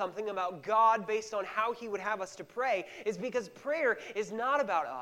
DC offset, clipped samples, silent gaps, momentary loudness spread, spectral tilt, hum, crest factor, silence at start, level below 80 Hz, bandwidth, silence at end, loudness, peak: under 0.1%; under 0.1%; none; 10 LU; -4 dB/octave; none; 18 dB; 0 s; -78 dBFS; 16 kHz; 0 s; -32 LUFS; -16 dBFS